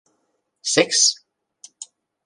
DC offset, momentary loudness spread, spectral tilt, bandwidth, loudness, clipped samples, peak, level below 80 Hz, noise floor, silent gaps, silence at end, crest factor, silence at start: under 0.1%; 24 LU; -0.5 dB/octave; 11.5 kHz; -17 LUFS; under 0.1%; 0 dBFS; -74 dBFS; -71 dBFS; none; 0.4 s; 24 dB; 0.65 s